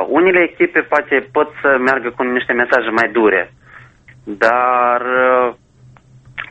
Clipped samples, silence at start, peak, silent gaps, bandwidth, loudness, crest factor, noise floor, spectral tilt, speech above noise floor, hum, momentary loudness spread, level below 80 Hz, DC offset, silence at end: under 0.1%; 0 s; 0 dBFS; none; 8.4 kHz; -14 LUFS; 16 dB; -46 dBFS; -6 dB/octave; 31 dB; none; 6 LU; -54 dBFS; under 0.1%; 0.05 s